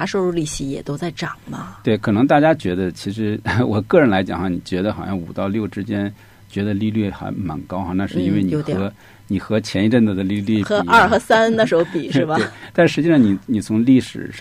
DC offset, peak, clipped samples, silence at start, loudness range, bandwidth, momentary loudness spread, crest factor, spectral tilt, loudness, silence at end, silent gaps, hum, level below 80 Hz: under 0.1%; -2 dBFS; under 0.1%; 0 s; 7 LU; 15 kHz; 12 LU; 16 dB; -6.5 dB/octave; -18 LUFS; 0 s; none; none; -48 dBFS